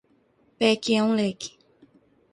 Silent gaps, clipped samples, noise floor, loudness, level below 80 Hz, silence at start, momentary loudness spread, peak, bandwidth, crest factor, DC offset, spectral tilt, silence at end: none; under 0.1%; -63 dBFS; -23 LUFS; -68 dBFS; 0.6 s; 15 LU; -6 dBFS; 11 kHz; 20 dB; under 0.1%; -4.5 dB/octave; 0.85 s